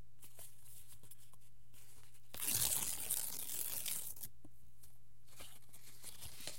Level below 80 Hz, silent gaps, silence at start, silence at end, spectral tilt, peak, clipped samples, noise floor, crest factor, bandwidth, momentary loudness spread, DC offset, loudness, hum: -70 dBFS; none; 0 s; 0 s; -0.5 dB/octave; -16 dBFS; under 0.1%; -67 dBFS; 30 dB; 17 kHz; 25 LU; 0.6%; -39 LUFS; none